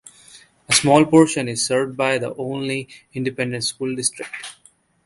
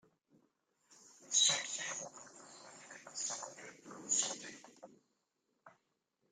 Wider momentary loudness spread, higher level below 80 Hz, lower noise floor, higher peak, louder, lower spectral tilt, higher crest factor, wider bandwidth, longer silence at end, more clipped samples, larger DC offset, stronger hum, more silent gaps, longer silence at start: second, 18 LU vs 25 LU; first, -58 dBFS vs under -90 dBFS; second, -56 dBFS vs -84 dBFS; first, 0 dBFS vs -18 dBFS; first, -19 LUFS vs -35 LUFS; first, -4 dB/octave vs 1 dB/octave; second, 20 dB vs 26 dB; second, 11.5 kHz vs 14.5 kHz; about the same, 0.55 s vs 0.65 s; neither; neither; neither; neither; second, 0.35 s vs 0.9 s